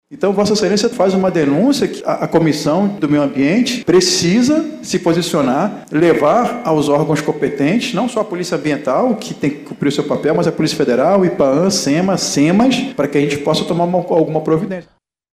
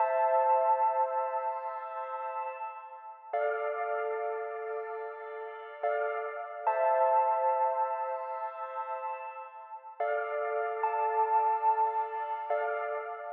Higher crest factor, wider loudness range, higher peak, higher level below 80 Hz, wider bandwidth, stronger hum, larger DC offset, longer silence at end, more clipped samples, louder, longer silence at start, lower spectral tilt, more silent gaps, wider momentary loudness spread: about the same, 14 dB vs 14 dB; about the same, 3 LU vs 5 LU; first, 0 dBFS vs -16 dBFS; first, -52 dBFS vs under -90 dBFS; first, 15.5 kHz vs 3.7 kHz; neither; neither; first, 0.55 s vs 0 s; neither; first, -15 LUFS vs -31 LUFS; about the same, 0.1 s vs 0 s; first, -5 dB/octave vs -2 dB/octave; neither; second, 6 LU vs 14 LU